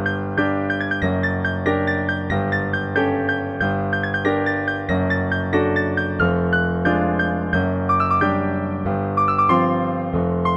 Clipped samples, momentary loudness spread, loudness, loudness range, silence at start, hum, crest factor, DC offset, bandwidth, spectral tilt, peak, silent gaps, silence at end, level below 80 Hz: under 0.1%; 4 LU; -20 LUFS; 2 LU; 0 s; none; 16 dB; under 0.1%; 7 kHz; -8.5 dB/octave; -4 dBFS; none; 0 s; -42 dBFS